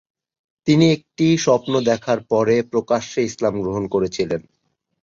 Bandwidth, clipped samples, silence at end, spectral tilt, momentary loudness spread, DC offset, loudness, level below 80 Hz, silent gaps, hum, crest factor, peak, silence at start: 7.6 kHz; under 0.1%; 0.6 s; -6 dB/octave; 8 LU; under 0.1%; -19 LUFS; -52 dBFS; none; none; 18 dB; -2 dBFS; 0.65 s